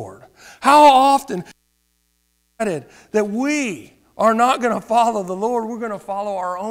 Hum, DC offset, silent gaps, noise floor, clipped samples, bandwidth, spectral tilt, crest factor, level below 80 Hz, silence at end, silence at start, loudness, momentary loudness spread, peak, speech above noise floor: 60 Hz at -50 dBFS; under 0.1%; none; -66 dBFS; under 0.1%; 16 kHz; -4 dB/octave; 16 dB; -60 dBFS; 0 s; 0 s; -17 LUFS; 17 LU; -4 dBFS; 49 dB